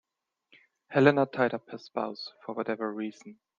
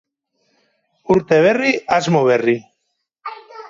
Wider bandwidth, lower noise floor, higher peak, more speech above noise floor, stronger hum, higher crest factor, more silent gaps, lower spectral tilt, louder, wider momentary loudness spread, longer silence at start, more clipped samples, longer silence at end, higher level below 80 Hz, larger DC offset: about the same, 7.4 kHz vs 7.6 kHz; about the same, -73 dBFS vs -73 dBFS; about the same, -4 dBFS vs -2 dBFS; second, 44 dB vs 58 dB; neither; first, 26 dB vs 16 dB; neither; first, -7.5 dB/octave vs -6 dB/octave; second, -29 LUFS vs -16 LUFS; second, 16 LU vs 20 LU; second, 0.9 s vs 1.1 s; neither; first, 0.25 s vs 0 s; second, -74 dBFS vs -58 dBFS; neither